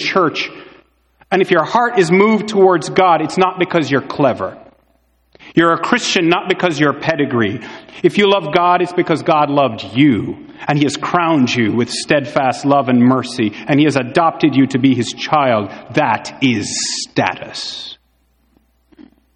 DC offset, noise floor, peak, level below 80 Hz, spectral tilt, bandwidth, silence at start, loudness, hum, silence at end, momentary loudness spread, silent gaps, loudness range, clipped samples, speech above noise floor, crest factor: under 0.1%; -59 dBFS; 0 dBFS; -56 dBFS; -5 dB/octave; 11 kHz; 0 s; -15 LUFS; none; 0.35 s; 8 LU; none; 3 LU; under 0.1%; 44 dB; 16 dB